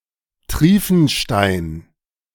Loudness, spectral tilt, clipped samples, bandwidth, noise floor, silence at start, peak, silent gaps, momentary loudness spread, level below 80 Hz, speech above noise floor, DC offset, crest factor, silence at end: -16 LUFS; -5.5 dB/octave; under 0.1%; 18 kHz; -43 dBFS; 0.5 s; 0 dBFS; none; 15 LU; -34 dBFS; 28 dB; under 0.1%; 18 dB; 0.55 s